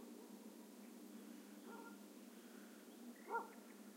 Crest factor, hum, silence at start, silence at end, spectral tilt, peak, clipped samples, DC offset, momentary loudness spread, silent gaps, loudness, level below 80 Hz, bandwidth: 22 dB; none; 0 s; 0 s; -4 dB/octave; -32 dBFS; under 0.1%; under 0.1%; 11 LU; none; -55 LUFS; under -90 dBFS; 16 kHz